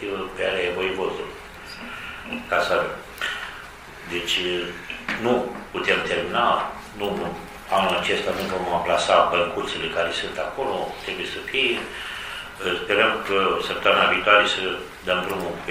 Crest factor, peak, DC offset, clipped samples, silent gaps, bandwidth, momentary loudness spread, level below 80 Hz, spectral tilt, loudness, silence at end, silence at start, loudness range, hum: 22 dB; -2 dBFS; under 0.1%; under 0.1%; none; 16 kHz; 14 LU; -50 dBFS; -3.5 dB/octave; -23 LUFS; 0 s; 0 s; 6 LU; none